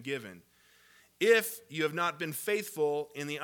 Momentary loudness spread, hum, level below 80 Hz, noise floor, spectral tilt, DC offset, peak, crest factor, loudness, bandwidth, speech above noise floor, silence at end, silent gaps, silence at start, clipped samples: 12 LU; none; -82 dBFS; -63 dBFS; -3.5 dB/octave; under 0.1%; -12 dBFS; 22 dB; -31 LUFS; 19 kHz; 31 dB; 0 s; none; 0 s; under 0.1%